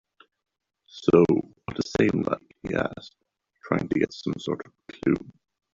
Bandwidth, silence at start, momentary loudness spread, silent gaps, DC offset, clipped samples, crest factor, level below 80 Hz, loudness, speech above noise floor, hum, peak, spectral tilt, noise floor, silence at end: 7.6 kHz; 0.95 s; 14 LU; none; under 0.1%; under 0.1%; 22 dB; -56 dBFS; -26 LUFS; 27 dB; none; -4 dBFS; -7 dB/octave; -51 dBFS; 0.45 s